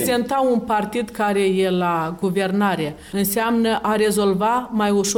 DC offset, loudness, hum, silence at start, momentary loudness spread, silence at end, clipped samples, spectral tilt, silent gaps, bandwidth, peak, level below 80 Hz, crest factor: under 0.1%; -20 LUFS; none; 0 s; 4 LU; 0 s; under 0.1%; -4.5 dB/octave; none; 18 kHz; -8 dBFS; -50 dBFS; 10 dB